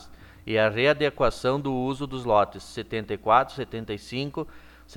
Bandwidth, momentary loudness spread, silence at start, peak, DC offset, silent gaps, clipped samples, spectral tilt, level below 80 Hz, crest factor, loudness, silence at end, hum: 19 kHz; 13 LU; 0 s; -6 dBFS; under 0.1%; none; under 0.1%; -6 dB/octave; -46 dBFS; 20 dB; -25 LUFS; 0 s; none